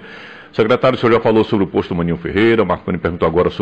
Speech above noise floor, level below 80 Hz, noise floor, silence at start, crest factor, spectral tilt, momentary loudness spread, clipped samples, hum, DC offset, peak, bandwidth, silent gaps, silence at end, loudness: 21 dB; -40 dBFS; -36 dBFS; 0 s; 12 dB; -8 dB/octave; 7 LU; under 0.1%; none; under 0.1%; -4 dBFS; 8 kHz; none; 0 s; -16 LUFS